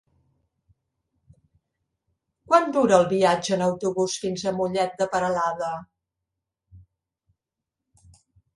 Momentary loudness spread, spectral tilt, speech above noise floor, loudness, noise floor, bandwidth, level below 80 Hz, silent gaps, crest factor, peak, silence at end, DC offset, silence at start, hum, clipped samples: 8 LU; -5 dB/octave; 64 dB; -23 LUFS; -86 dBFS; 11.5 kHz; -64 dBFS; none; 24 dB; -2 dBFS; 1.8 s; under 0.1%; 2.5 s; none; under 0.1%